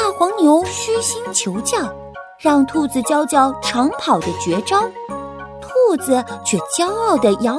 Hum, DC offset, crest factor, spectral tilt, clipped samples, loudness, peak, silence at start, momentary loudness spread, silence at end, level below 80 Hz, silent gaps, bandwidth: none; under 0.1%; 16 dB; -3.5 dB/octave; under 0.1%; -17 LUFS; -2 dBFS; 0 s; 12 LU; 0 s; -50 dBFS; none; 11 kHz